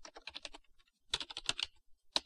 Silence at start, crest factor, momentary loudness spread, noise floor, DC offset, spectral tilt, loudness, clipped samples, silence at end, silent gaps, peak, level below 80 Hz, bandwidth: 0 s; 32 dB; 13 LU; -67 dBFS; under 0.1%; 0 dB/octave; -40 LUFS; under 0.1%; 0.05 s; none; -12 dBFS; -64 dBFS; 14 kHz